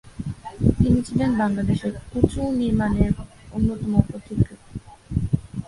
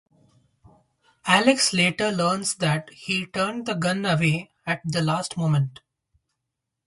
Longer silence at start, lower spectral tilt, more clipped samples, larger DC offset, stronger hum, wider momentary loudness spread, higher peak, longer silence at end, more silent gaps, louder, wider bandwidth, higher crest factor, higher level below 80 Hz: second, 0.05 s vs 1.25 s; first, -8.5 dB/octave vs -4.5 dB/octave; neither; neither; neither; first, 13 LU vs 10 LU; first, 0 dBFS vs -4 dBFS; second, 0.05 s vs 1.15 s; neither; about the same, -23 LUFS vs -23 LUFS; about the same, 11.5 kHz vs 11.5 kHz; about the same, 22 dB vs 22 dB; first, -34 dBFS vs -62 dBFS